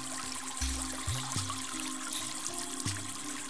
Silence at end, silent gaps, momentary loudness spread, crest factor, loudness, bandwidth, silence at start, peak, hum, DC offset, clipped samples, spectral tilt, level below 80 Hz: 0 s; none; 3 LU; 22 dB; -35 LUFS; 11 kHz; 0 s; -16 dBFS; none; 0.5%; under 0.1%; -2 dB/octave; -48 dBFS